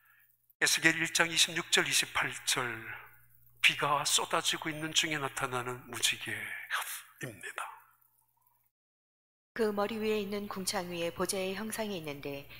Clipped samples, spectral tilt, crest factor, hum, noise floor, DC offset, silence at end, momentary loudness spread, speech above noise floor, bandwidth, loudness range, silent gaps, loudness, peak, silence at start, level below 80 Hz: under 0.1%; -1.5 dB/octave; 26 dB; 60 Hz at -65 dBFS; -73 dBFS; under 0.1%; 0 s; 15 LU; 40 dB; 16 kHz; 10 LU; 8.71-9.55 s; -31 LUFS; -8 dBFS; 0.6 s; -68 dBFS